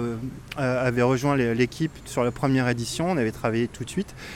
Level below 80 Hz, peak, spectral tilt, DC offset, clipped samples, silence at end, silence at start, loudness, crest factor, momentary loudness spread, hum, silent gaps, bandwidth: -48 dBFS; -8 dBFS; -6 dB/octave; under 0.1%; under 0.1%; 0 s; 0 s; -25 LUFS; 16 dB; 9 LU; none; none; 16 kHz